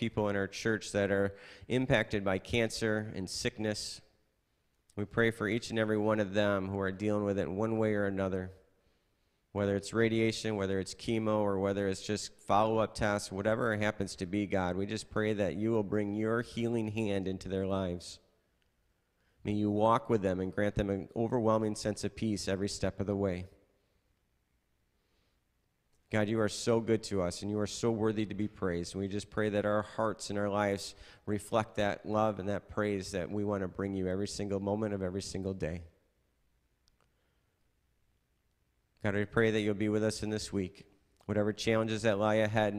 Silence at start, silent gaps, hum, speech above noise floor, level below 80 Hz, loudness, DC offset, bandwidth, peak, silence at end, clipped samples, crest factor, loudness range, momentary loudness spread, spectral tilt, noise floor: 0 s; none; none; 44 dB; -58 dBFS; -33 LUFS; under 0.1%; 15 kHz; -14 dBFS; 0 s; under 0.1%; 20 dB; 6 LU; 8 LU; -5.5 dB/octave; -77 dBFS